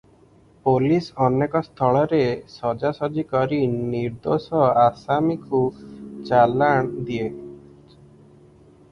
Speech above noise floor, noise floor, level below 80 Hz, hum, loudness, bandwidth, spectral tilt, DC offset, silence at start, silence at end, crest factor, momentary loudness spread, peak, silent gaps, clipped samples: 33 dB; -53 dBFS; -54 dBFS; none; -21 LUFS; 10 kHz; -8.5 dB/octave; under 0.1%; 0.65 s; 1.35 s; 18 dB; 10 LU; -4 dBFS; none; under 0.1%